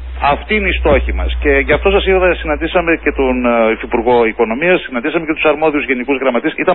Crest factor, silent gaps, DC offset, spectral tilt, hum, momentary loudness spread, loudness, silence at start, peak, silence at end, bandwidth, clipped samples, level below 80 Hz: 12 dB; none; 0.7%; -11.5 dB/octave; none; 4 LU; -13 LUFS; 0 s; 0 dBFS; 0 s; 4.2 kHz; under 0.1%; -24 dBFS